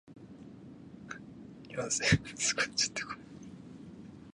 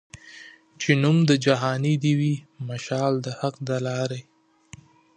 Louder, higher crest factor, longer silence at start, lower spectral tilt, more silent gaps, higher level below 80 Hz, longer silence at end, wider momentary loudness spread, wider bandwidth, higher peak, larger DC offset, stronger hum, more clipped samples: second, -31 LUFS vs -24 LUFS; about the same, 24 dB vs 20 dB; about the same, 0.05 s vs 0.15 s; second, -2.5 dB/octave vs -6 dB/octave; neither; first, -56 dBFS vs -66 dBFS; second, 0 s vs 0.95 s; first, 22 LU vs 18 LU; first, 11.5 kHz vs 9.6 kHz; second, -12 dBFS vs -4 dBFS; neither; neither; neither